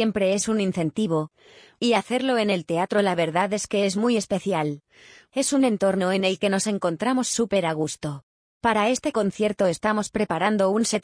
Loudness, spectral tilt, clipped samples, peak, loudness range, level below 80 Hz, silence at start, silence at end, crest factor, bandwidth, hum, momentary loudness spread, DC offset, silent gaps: -23 LUFS; -4.5 dB/octave; under 0.1%; -8 dBFS; 1 LU; -60 dBFS; 0 s; 0 s; 16 dB; 10.5 kHz; none; 6 LU; under 0.1%; 8.23-8.61 s